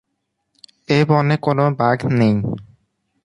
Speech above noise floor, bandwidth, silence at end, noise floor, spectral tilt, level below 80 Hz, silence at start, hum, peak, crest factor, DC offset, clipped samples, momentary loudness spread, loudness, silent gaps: 58 dB; 10.5 kHz; 0.6 s; -74 dBFS; -8 dB/octave; -52 dBFS; 0.9 s; none; -2 dBFS; 16 dB; under 0.1%; under 0.1%; 7 LU; -17 LUFS; none